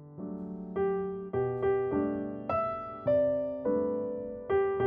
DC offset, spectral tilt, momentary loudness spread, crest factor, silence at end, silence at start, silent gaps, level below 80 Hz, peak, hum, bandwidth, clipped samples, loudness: under 0.1%; -7.5 dB/octave; 10 LU; 12 dB; 0 s; 0 s; none; -62 dBFS; -18 dBFS; none; 3.6 kHz; under 0.1%; -32 LUFS